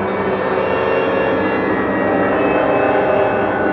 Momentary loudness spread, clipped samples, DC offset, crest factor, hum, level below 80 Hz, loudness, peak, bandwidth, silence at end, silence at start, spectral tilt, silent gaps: 3 LU; under 0.1%; under 0.1%; 12 dB; none; -44 dBFS; -16 LUFS; -4 dBFS; 5.8 kHz; 0 s; 0 s; -9 dB/octave; none